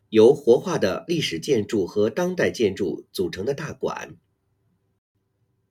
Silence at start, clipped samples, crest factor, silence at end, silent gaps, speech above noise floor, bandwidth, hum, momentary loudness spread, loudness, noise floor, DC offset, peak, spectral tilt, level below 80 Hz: 0.1 s; under 0.1%; 18 dB; 1.6 s; none; 48 dB; 15.5 kHz; none; 13 LU; -22 LUFS; -70 dBFS; under 0.1%; -4 dBFS; -5.5 dB/octave; -60 dBFS